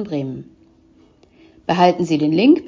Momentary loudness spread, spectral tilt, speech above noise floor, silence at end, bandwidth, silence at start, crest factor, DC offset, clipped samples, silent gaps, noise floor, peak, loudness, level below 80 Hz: 16 LU; -7 dB/octave; 36 dB; 0 s; 7.6 kHz; 0 s; 18 dB; under 0.1%; under 0.1%; none; -52 dBFS; 0 dBFS; -17 LUFS; -58 dBFS